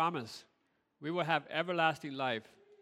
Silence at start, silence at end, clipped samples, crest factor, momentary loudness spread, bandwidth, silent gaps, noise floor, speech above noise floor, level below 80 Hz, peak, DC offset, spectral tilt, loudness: 0 s; 0.4 s; under 0.1%; 22 dB; 14 LU; 14.5 kHz; none; -71 dBFS; 36 dB; -84 dBFS; -16 dBFS; under 0.1%; -5 dB/octave; -35 LUFS